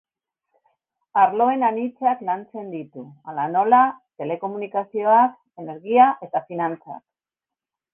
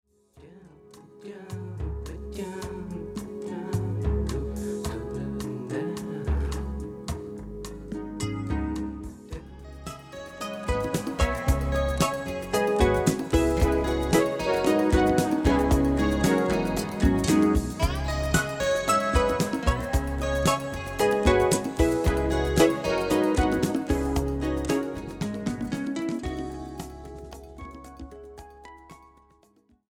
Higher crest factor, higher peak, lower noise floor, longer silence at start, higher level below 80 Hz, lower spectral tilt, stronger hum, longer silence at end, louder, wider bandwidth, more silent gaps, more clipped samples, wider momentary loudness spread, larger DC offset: about the same, 20 dB vs 20 dB; first, -2 dBFS vs -6 dBFS; first, -89 dBFS vs -63 dBFS; first, 1.15 s vs 0.35 s; second, -70 dBFS vs -34 dBFS; first, -9 dB/octave vs -5.5 dB/octave; neither; about the same, 0.95 s vs 0.95 s; first, -20 LUFS vs -26 LUFS; second, 3.6 kHz vs 19 kHz; neither; neither; about the same, 19 LU vs 18 LU; neither